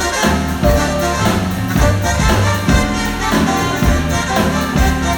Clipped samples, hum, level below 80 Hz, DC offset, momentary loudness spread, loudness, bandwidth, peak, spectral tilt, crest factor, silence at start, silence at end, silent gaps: under 0.1%; none; -20 dBFS; under 0.1%; 2 LU; -15 LUFS; over 20 kHz; 0 dBFS; -5 dB/octave; 14 dB; 0 s; 0 s; none